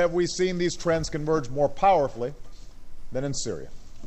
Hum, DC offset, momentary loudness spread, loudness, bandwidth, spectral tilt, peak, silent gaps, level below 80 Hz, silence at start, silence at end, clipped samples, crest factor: none; under 0.1%; 13 LU; -26 LUFS; 8.6 kHz; -5 dB/octave; -10 dBFS; none; -42 dBFS; 0 s; 0 s; under 0.1%; 16 dB